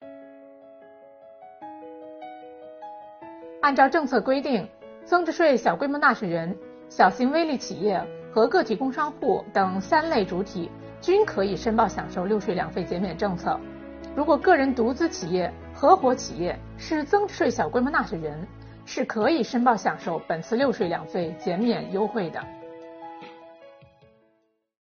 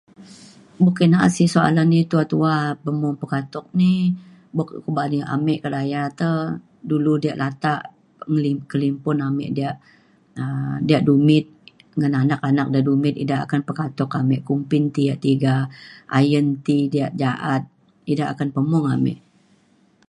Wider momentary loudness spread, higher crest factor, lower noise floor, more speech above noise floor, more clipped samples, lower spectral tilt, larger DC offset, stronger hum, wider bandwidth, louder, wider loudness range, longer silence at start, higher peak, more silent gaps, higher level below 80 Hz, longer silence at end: first, 21 LU vs 11 LU; about the same, 20 dB vs 18 dB; first, -69 dBFS vs -58 dBFS; first, 45 dB vs 38 dB; neither; second, -4 dB/octave vs -7.5 dB/octave; neither; neither; second, 6.8 kHz vs 11.5 kHz; second, -24 LUFS vs -20 LUFS; about the same, 5 LU vs 4 LU; second, 0 s vs 0.2 s; about the same, -4 dBFS vs -2 dBFS; neither; first, -52 dBFS vs -60 dBFS; first, 1.15 s vs 0.9 s